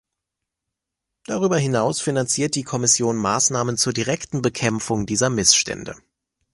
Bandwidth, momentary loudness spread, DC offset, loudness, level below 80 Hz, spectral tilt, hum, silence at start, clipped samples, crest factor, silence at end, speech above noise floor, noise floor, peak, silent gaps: 11.5 kHz; 8 LU; under 0.1%; -20 LUFS; -52 dBFS; -3 dB/octave; none; 1.3 s; under 0.1%; 22 dB; 0.55 s; 62 dB; -83 dBFS; 0 dBFS; none